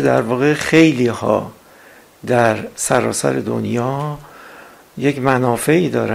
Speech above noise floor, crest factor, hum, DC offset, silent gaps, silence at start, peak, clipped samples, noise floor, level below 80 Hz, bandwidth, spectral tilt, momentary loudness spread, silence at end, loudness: 29 dB; 16 dB; none; under 0.1%; none; 0 s; 0 dBFS; 0.1%; -45 dBFS; -52 dBFS; 16 kHz; -5.5 dB/octave; 12 LU; 0 s; -16 LUFS